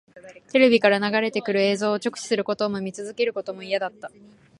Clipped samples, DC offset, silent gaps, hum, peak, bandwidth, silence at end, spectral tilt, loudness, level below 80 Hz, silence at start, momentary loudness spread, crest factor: under 0.1%; under 0.1%; none; none; -2 dBFS; 11.5 kHz; 0.5 s; -4.5 dB/octave; -23 LUFS; -70 dBFS; 0.15 s; 15 LU; 22 dB